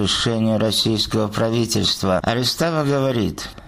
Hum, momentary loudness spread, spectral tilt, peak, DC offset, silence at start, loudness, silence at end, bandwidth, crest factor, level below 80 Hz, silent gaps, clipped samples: none; 3 LU; -4.5 dB/octave; -6 dBFS; under 0.1%; 0 s; -19 LUFS; 0 s; 15.5 kHz; 14 dB; -44 dBFS; none; under 0.1%